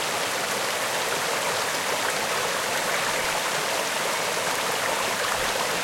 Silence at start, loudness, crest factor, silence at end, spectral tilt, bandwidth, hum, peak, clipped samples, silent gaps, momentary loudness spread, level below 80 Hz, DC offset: 0 s; -24 LUFS; 16 dB; 0 s; -1 dB/octave; 16.5 kHz; none; -10 dBFS; under 0.1%; none; 1 LU; -58 dBFS; under 0.1%